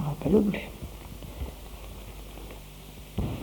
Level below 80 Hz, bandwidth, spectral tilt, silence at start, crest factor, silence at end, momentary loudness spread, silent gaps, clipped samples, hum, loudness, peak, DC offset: -42 dBFS; 19 kHz; -7 dB/octave; 0 s; 22 dB; 0 s; 20 LU; none; under 0.1%; none; -30 LUFS; -8 dBFS; under 0.1%